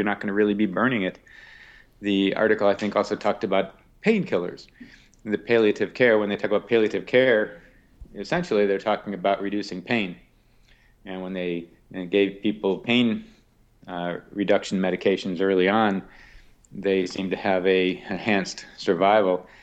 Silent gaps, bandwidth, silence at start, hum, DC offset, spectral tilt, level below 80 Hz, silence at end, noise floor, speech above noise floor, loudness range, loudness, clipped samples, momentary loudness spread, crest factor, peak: none; 8.8 kHz; 0 s; none; under 0.1%; -6 dB/octave; -58 dBFS; 0.2 s; -58 dBFS; 35 dB; 4 LU; -23 LUFS; under 0.1%; 13 LU; 18 dB; -6 dBFS